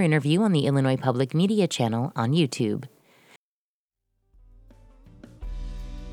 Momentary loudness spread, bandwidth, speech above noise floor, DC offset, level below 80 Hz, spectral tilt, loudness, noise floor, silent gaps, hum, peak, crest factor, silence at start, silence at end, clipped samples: 18 LU; 13.5 kHz; over 67 dB; under 0.1%; -44 dBFS; -6.5 dB/octave; -24 LUFS; under -90 dBFS; 3.36-3.89 s; none; -6 dBFS; 20 dB; 0 s; 0 s; under 0.1%